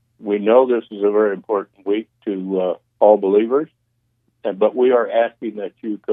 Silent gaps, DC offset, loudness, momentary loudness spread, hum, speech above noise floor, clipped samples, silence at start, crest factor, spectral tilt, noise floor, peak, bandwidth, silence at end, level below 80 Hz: none; under 0.1%; -18 LUFS; 13 LU; none; 50 dB; under 0.1%; 0.2 s; 18 dB; -9.5 dB/octave; -68 dBFS; 0 dBFS; 3.8 kHz; 0 s; -76 dBFS